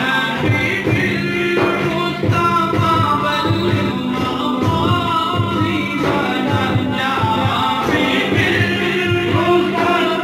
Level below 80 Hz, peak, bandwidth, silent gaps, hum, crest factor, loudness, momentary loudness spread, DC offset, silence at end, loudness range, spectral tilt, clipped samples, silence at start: -42 dBFS; -4 dBFS; 16 kHz; none; none; 12 dB; -16 LUFS; 3 LU; under 0.1%; 0 s; 1 LU; -6 dB/octave; under 0.1%; 0 s